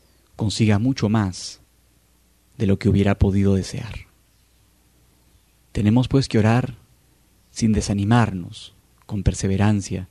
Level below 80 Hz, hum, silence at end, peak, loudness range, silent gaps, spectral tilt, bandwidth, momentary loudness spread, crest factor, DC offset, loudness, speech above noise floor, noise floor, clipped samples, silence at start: -38 dBFS; none; 0.05 s; -4 dBFS; 2 LU; none; -6.5 dB/octave; 11.5 kHz; 14 LU; 18 dB; under 0.1%; -21 LUFS; 40 dB; -59 dBFS; under 0.1%; 0.4 s